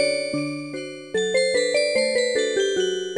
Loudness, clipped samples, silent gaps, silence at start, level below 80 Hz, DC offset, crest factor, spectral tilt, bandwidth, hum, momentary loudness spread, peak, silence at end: -22 LUFS; under 0.1%; none; 0 s; -66 dBFS; under 0.1%; 14 dB; -2.5 dB/octave; 11.5 kHz; none; 9 LU; -8 dBFS; 0 s